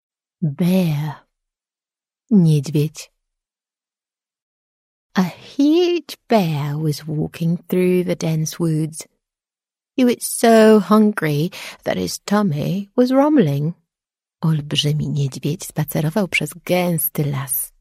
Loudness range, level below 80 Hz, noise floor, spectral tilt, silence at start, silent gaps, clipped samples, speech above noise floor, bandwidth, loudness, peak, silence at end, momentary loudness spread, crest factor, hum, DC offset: 6 LU; -56 dBFS; under -90 dBFS; -6 dB/octave; 0.4 s; 4.42-5.10 s; under 0.1%; over 72 dB; 16 kHz; -18 LUFS; -2 dBFS; 0.15 s; 11 LU; 16 dB; none; under 0.1%